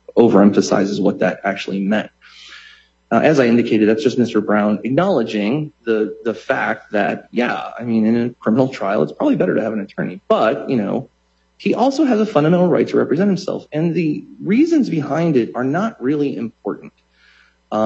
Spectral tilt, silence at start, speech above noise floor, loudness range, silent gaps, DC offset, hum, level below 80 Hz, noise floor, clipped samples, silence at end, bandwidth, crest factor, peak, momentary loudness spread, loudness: -7 dB/octave; 0.1 s; 36 dB; 3 LU; none; under 0.1%; none; -62 dBFS; -53 dBFS; under 0.1%; 0 s; 8 kHz; 16 dB; 0 dBFS; 10 LU; -17 LUFS